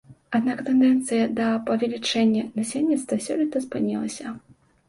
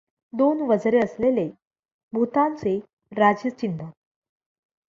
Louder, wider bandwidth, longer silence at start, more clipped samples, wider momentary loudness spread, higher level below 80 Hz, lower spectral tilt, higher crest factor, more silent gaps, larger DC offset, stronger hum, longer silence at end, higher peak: about the same, -23 LUFS vs -23 LUFS; first, 11.5 kHz vs 7.4 kHz; second, 0.1 s vs 0.35 s; neither; second, 9 LU vs 13 LU; about the same, -64 dBFS vs -64 dBFS; second, -4.5 dB/octave vs -7.5 dB/octave; about the same, 14 dB vs 18 dB; second, none vs 1.67-1.71 s, 1.92-2.09 s, 2.93-2.97 s; neither; neither; second, 0.5 s vs 1.05 s; second, -10 dBFS vs -6 dBFS